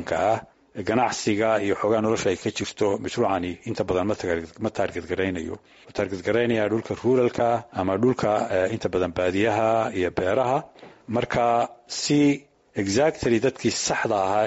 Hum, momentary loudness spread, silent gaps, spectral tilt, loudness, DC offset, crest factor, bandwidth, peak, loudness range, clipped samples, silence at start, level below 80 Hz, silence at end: none; 8 LU; none; -4.5 dB/octave; -24 LUFS; under 0.1%; 14 dB; 8 kHz; -10 dBFS; 3 LU; under 0.1%; 0 s; -54 dBFS; 0 s